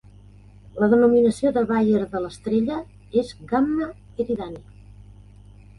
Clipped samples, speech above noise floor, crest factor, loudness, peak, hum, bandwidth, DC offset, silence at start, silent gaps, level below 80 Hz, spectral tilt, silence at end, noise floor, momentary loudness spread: under 0.1%; 26 dB; 16 dB; -22 LUFS; -6 dBFS; 50 Hz at -45 dBFS; 11.5 kHz; under 0.1%; 0.75 s; none; -50 dBFS; -7.5 dB/octave; 1.15 s; -47 dBFS; 15 LU